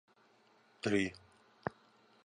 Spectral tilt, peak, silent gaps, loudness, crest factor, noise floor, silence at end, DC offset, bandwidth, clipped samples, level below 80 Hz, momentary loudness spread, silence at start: -5.5 dB/octave; -18 dBFS; none; -38 LUFS; 22 dB; -68 dBFS; 0.55 s; under 0.1%; 10.5 kHz; under 0.1%; -68 dBFS; 11 LU; 0.85 s